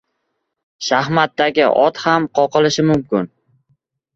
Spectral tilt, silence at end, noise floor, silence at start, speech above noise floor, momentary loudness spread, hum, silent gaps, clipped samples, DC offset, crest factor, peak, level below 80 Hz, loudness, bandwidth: -5 dB/octave; 0.9 s; -73 dBFS; 0.8 s; 58 dB; 8 LU; none; none; under 0.1%; under 0.1%; 16 dB; -2 dBFS; -54 dBFS; -16 LUFS; 7.8 kHz